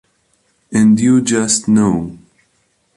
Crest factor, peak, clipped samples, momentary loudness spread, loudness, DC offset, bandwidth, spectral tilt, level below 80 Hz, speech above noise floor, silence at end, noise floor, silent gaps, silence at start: 14 dB; -2 dBFS; under 0.1%; 10 LU; -13 LUFS; under 0.1%; 11.5 kHz; -5 dB/octave; -48 dBFS; 49 dB; 0.8 s; -61 dBFS; none; 0.7 s